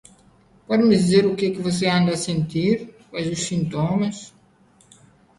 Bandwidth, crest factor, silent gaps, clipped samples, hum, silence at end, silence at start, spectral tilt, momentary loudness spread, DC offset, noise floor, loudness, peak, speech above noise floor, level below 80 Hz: 11.5 kHz; 18 dB; none; under 0.1%; none; 1.1 s; 0.7 s; -5.5 dB/octave; 11 LU; under 0.1%; -56 dBFS; -21 LUFS; -4 dBFS; 36 dB; -54 dBFS